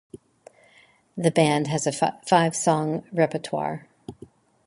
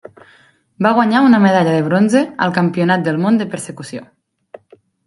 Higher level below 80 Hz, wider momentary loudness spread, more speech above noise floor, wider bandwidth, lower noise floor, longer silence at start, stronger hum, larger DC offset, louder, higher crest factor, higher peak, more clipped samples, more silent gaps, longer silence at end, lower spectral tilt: about the same, -64 dBFS vs -62 dBFS; first, 19 LU vs 16 LU; about the same, 35 dB vs 37 dB; about the same, 11.5 kHz vs 11.5 kHz; first, -57 dBFS vs -51 dBFS; first, 1.15 s vs 0.8 s; neither; neither; second, -23 LUFS vs -14 LUFS; first, 22 dB vs 16 dB; second, -4 dBFS vs 0 dBFS; neither; neither; second, 0.55 s vs 1.05 s; second, -5 dB/octave vs -6.5 dB/octave